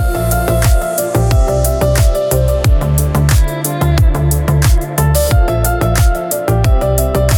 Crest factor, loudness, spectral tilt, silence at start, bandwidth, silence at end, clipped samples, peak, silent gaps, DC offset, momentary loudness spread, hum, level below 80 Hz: 12 dB; -13 LUFS; -5.5 dB/octave; 0 s; 19 kHz; 0 s; under 0.1%; 0 dBFS; none; under 0.1%; 3 LU; none; -14 dBFS